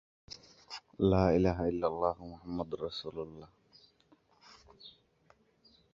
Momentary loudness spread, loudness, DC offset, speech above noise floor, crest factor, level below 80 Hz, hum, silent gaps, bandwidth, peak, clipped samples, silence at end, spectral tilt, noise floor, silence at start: 25 LU; -33 LUFS; under 0.1%; 36 dB; 24 dB; -52 dBFS; none; none; 7.4 kHz; -12 dBFS; under 0.1%; 1.05 s; -7.5 dB/octave; -68 dBFS; 0.3 s